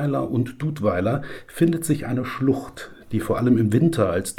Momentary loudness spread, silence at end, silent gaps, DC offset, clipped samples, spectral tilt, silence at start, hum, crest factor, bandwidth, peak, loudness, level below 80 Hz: 10 LU; 0.05 s; none; under 0.1%; under 0.1%; -7 dB/octave; 0 s; none; 16 dB; 17 kHz; -6 dBFS; -22 LUFS; -50 dBFS